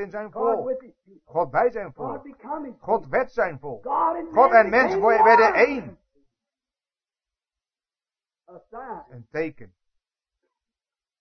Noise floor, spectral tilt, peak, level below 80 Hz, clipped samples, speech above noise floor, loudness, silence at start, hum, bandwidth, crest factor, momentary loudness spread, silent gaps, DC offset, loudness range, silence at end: under -90 dBFS; -6 dB/octave; -2 dBFS; -58 dBFS; under 0.1%; over 68 dB; -20 LUFS; 0 s; none; 6.4 kHz; 22 dB; 19 LU; none; under 0.1%; 19 LU; 1.55 s